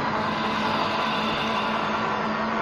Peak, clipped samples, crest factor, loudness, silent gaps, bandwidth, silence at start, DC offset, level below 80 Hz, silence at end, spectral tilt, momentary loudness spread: -12 dBFS; under 0.1%; 14 dB; -25 LUFS; none; 13 kHz; 0 s; under 0.1%; -52 dBFS; 0 s; -5 dB/octave; 1 LU